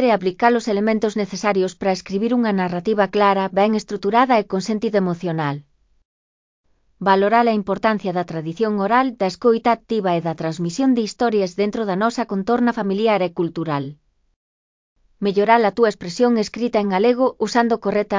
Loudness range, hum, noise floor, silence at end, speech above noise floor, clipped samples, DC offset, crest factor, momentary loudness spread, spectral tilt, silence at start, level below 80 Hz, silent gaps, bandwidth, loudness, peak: 3 LU; none; under -90 dBFS; 0 s; over 71 dB; under 0.1%; under 0.1%; 20 dB; 8 LU; -6 dB/octave; 0 s; -58 dBFS; 6.05-6.64 s, 14.36-14.96 s; 7.6 kHz; -19 LUFS; 0 dBFS